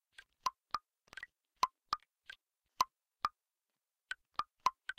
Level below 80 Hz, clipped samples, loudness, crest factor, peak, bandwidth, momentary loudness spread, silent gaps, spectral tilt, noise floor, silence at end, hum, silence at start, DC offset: -74 dBFS; under 0.1%; -41 LUFS; 28 dB; -16 dBFS; 15.5 kHz; 18 LU; none; 0 dB/octave; under -90 dBFS; 0.05 s; none; 0.45 s; under 0.1%